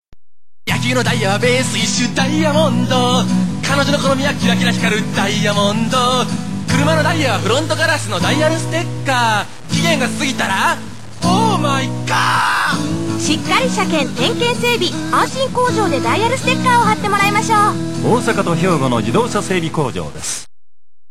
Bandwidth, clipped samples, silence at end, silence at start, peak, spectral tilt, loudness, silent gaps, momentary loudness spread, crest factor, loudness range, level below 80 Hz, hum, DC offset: 16 kHz; under 0.1%; 0.65 s; 0 s; 0 dBFS; -4.5 dB/octave; -15 LUFS; none; 6 LU; 14 dB; 2 LU; -42 dBFS; none; 3%